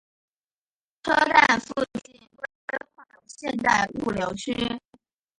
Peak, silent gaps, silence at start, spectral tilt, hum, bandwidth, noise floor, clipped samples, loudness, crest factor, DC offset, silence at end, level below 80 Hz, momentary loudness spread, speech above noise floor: -4 dBFS; 2.55-2.68 s; 1.05 s; -3.5 dB/octave; none; 11.5 kHz; under -90 dBFS; under 0.1%; -24 LUFS; 24 dB; under 0.1%; 0.6 s; -56 dBFS; 19 LU; over 67 dB